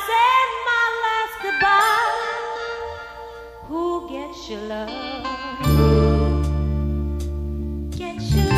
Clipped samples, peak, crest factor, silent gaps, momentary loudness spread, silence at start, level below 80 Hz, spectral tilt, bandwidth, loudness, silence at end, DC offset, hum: under 0.1%; -4 dBFS; 16 dB; none; 16 LU; 0 s; -28 dBFS; -6 dB/octave; 15.5 kHz; -21 LUFS; 0 s; under 0.1%; none